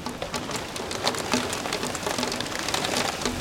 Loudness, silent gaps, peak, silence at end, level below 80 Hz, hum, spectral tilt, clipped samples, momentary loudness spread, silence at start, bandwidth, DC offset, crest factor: -27 LUFS; none; -4 dBFS; 0 s; -50 dBFS; none; -2.5 dB/octave; under 0.1%; 6 LU; 0 s; 17 kHz; under 0.1%; 24 dB